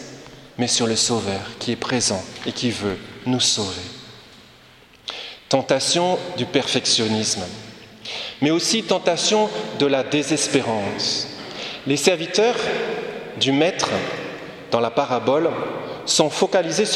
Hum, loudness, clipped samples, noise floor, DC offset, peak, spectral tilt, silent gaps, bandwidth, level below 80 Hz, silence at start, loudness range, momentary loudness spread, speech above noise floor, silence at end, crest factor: none; -21 LUFS; under 0.1%; -49 dBFS; under 0.1%; 0 dBFS; -3 dB/octave; none; 15 kHz; -58 dBFS; 0 s; 3 LU; 13 LU; 28 dB; 0 s; 22 dB